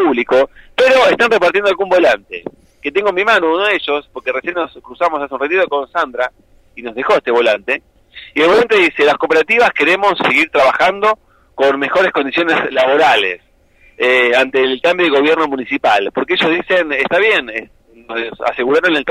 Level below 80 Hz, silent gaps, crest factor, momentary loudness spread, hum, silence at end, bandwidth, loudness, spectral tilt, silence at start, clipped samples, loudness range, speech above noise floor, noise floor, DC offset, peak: -50 dBFS; none; 12 dB; 11 LU; none; 0 s; 13.5 kHz; -13 LUFS; -4 dB/octave; 0 s; under 0.1%; 5 LU; 36 dB; -49 dBFS; under 0.1%; -2 dBFS